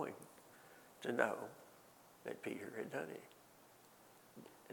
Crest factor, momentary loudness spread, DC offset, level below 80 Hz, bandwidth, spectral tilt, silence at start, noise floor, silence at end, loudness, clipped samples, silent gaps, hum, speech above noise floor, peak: 30 dB; 25 LU; under 0.1%; -90 dBFS; 19 kHz; -4.5 dB/octave; 0 s; -65 dBFS; 0 s; -45 LUFS; under 0.1%; none; none; 22 dB; -18 dBFS